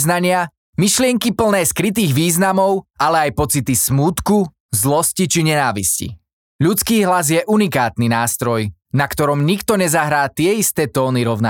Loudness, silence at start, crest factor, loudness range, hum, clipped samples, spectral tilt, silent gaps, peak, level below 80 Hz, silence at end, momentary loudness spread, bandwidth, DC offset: -16 LUFS; 0 s; 14 dB; 1 LU; none; under 0.1%; -4.5 dB/octave; 0.58-0.73 s, 4.60-4.69 s, 6.33-6.59 s; -2 dBFS; -44 dBFS; 0 s; 4 LU; 19 kHz; under 0.1%